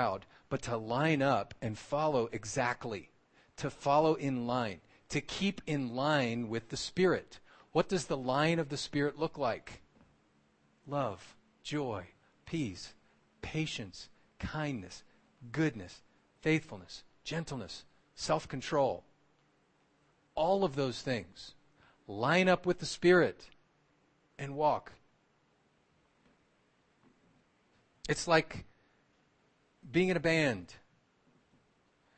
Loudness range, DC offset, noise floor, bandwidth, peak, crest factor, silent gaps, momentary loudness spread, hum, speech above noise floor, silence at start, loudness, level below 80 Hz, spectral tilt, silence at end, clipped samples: 9 LU; under 0.1%; -72 dBFS; 8.4 kHz; -12 dBFS; 24 dB; none; 19 LU; none; 39 dB; 0 s; -33 LUFS; -62 dBFS; -5.5 dB/octave; 1.4 s; under 0.1%